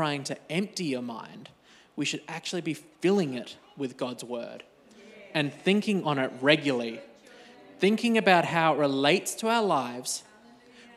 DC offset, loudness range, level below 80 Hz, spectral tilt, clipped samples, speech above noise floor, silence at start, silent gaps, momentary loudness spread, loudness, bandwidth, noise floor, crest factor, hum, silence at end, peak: under 0.1%; 7 LU; -78 dBFS; -4.5 dB/octave; under 0.1%; 27 dB; 0 s; none; 14 LU; -27 LUFS; 15 kHz; -54 dBFS; 24 dB; none; 0.15 s; -6 dBFS